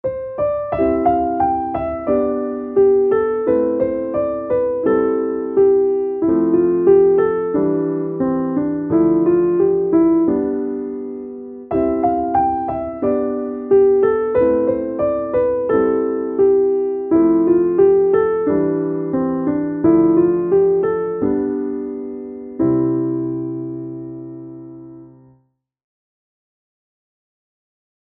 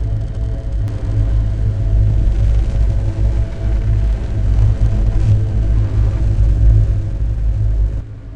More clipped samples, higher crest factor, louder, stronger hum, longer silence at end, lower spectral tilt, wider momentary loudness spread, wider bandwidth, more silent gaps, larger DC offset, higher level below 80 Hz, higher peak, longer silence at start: neither; about the same, 16 dB vs 12 dB; about the same, -17 LUFS vs -17 LUFS; neither; first, 3.05 s vs 0 s; first, -13 dB/octave vs -9 dB/octave; first, 12 LU vs 6 LU; second, 3.3 kHz vs 4.5 kHz; neither; neither; second, -48 dBFS vs -16 dBFS; about the same, -2 dBFS vs -2 dBFS; about the same, 0.05 s vs 0 s